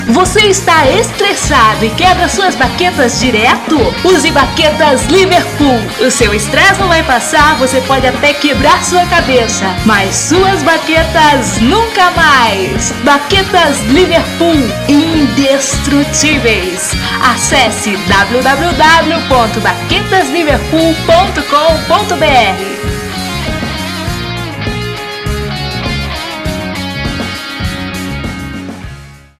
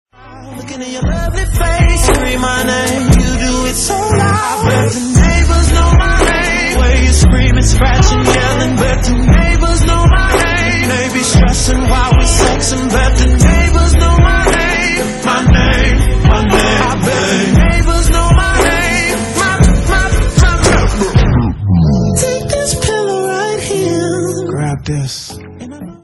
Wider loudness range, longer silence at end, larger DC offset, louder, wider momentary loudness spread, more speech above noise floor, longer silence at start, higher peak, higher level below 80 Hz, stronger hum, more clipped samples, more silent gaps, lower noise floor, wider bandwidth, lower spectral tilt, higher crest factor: first, 9 LU vs 3 LU; first, 0.25 s vs 0.1 s; neither; about the same, -9 LUFS vs -11 LUFS; first, 10 LU vs 7 LU; about the same, 22 dB vs 22 dB; second, 0 s vs 0.25 s; about the same, 0 dBFS vs 0 dBFS; second, -26 dBFS vs -14 dBFS; neither; about the same, 0.4% vs 0.3%; neither; about the same, -31 dBFS vs -31 dBFS; first, 19 kHz vs 13 kHz; about the same, -3.5 dB/octave vs -4.5 dB/octave; about the same, 10 dB vs 10 dB